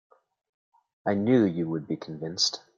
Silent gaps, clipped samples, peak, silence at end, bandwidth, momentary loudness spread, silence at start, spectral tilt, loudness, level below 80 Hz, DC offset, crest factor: none; under 0.1%; -10 dBFS; 0.2 s; 7.6 kHz; 12 LU; 1.05 s; -5 dB/octave; -27 LUFS; -68 dBFS; under 0.1%; 20 dB